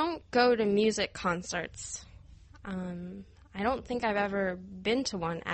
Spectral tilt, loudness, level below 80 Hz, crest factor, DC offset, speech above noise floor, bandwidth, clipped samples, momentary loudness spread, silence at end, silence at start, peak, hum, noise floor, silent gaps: -4.5 dB/octave; -31 LUFS; -56 dBFS; 20 dB; under 0.1%; 22 dB; 8.8 kHz; under 0.1%; 16 LU; 0 s; 0 s; -12 dBFS; none; -53 dBFS; none